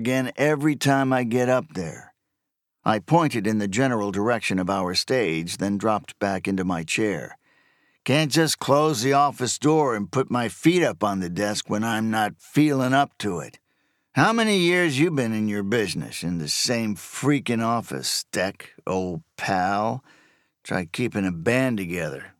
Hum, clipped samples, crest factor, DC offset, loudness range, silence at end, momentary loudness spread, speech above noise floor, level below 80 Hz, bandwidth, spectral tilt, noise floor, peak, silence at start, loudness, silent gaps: none; under 0.1%; 20 dB; under 0.1%; 4 LU; 0.1 s; 9 LU; 59 dB; -62 dBFS; 17 kHz; -5 dB/octave; -81 dBFS; -4 dBFS; 0 s; -23 LUFS; none